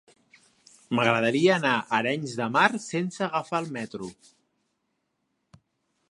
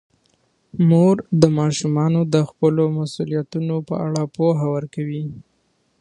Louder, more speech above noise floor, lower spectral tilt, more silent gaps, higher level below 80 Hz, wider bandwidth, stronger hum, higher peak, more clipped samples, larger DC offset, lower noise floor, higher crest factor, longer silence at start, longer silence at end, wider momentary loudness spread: second, -25 LUFS vs -19 LUFS; first, 52 dB vs 47 dB; second, -5 dB/octave vs -7.5 dB/octave; neither; second, -72 dBFS vs -58 dBFS; about the same, 11.5 kHz vs 10.5 kHz; neither; second, -4 dBFS vs 0 dBFS; neither; neither; first, -77 dBFS vs -65 dBFS; about the same, 24 dB vs 20 dB; first, 0.9 s vs 0.75 s; first, 2 s vs 0.6 s; about the same, 13 LU vs 11 LU